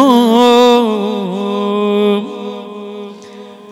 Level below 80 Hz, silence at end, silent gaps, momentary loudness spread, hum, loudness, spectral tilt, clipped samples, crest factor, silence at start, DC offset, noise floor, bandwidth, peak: -68 dBFS; 0 s; none; 21 LU; none; -12 LUFS; -5.5 dB/octave; 0.4%; 12 dB; 0 s; under 0.1%; -34 dBFS; 16 kHz; 0 dBFS